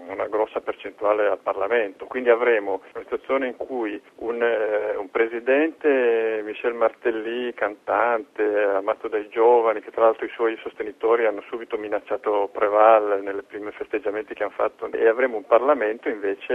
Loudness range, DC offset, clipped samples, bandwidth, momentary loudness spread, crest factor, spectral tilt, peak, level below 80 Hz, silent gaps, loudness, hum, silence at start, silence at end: 2 LU; under 0.1%; under 0.1%; 3.9 kHz; 11 LU; 20 dB; -5.5 dB/octave; -2 dBFS; -66 dBFS; none; -23 LUFS; none; 0 s; 0 s